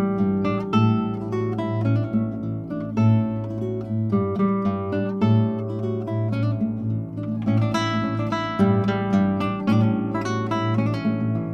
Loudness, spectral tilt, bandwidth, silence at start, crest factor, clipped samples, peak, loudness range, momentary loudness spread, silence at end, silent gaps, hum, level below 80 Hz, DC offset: -23 LUFS; -8.5 dB/octave; 6.8 kHz; 0 s; 16 dB; under 0.1%; -6 dBFS; 2 LU; 7 LU; 0 s; none; none; -54 dBFS; under 0.1%